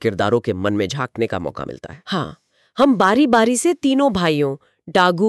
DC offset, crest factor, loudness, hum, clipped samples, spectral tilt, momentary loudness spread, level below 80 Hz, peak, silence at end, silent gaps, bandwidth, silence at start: under 0.1%; 14 dB; -18 LUFS; none; under 0.1%; -5 dB/octave; 17 LU; -52 dBFS; -4 dBFS; 0 s; none; 13 kHz; 0 s